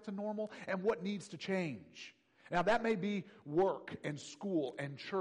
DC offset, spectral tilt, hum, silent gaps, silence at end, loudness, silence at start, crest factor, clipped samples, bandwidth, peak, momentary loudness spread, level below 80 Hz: under 0.1%; -6 dB/octave; none; none; 0 s; -38 LUFS; 0 s; 16 dB; under 0.1%; 11 kHz; -22 dBFS; 11 LU; -70 dBFS